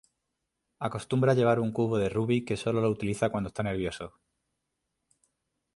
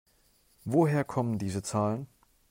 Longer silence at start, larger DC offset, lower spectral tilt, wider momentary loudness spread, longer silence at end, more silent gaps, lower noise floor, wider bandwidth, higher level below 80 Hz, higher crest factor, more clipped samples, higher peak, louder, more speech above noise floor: first, 0.8 s vs 0.65 s; neither; about the same, -7 dB/octave vs -7 dB/octave; second, 11 LU vs 14 LU; first, 1.7 s vs 0.45 s; neither; first, -83 dBFS vs -66 dBFS; second, 11.5 kHz vs 16 kHz; first, -56 dBFS vs -66 dBFS; about the same, 18 dB vs 18 dB; neither; about the same, -12 dBFS vs -12 dBFS; about the same, -29 LUFS vs -30 LUFS; first, 55 dB vs 38 dB